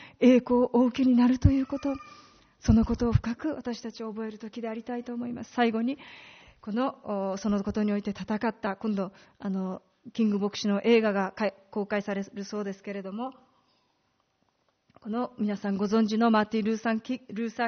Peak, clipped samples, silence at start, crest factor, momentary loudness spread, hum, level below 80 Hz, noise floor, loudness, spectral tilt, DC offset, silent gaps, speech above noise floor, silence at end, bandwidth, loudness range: -6 dBFS; under 0.1%; 0 s; 22 dB; 14 LU; none; -46 dBFS; -73 dBFS; -28 LUFS; -6 dB/octave; under 0.1%; none; 46 dB; 0 s; 6.6 kHz; 9 LU